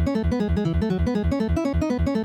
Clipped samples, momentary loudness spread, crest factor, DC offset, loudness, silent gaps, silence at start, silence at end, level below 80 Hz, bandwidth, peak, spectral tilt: under 0.1%; 0 LU; 8 dB; under 0.1%; -23 LUFS; none; 0 s; 0 s; -30 dBFS; 9.2 kHz; -14 dBFS; -8 dB/octave